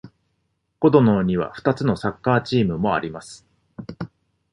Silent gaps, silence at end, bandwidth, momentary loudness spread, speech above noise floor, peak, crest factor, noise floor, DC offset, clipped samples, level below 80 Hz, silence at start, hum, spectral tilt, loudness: none; 0.45 s; 11.5 kHz; 21 LU; 52 dB; -2 dBFS; 20 dB; -72 dBFS; under 0.1%; under 0.1%; -50 dBFS; 0.05 s; none; -7.5 dB/octave; -20 LUFS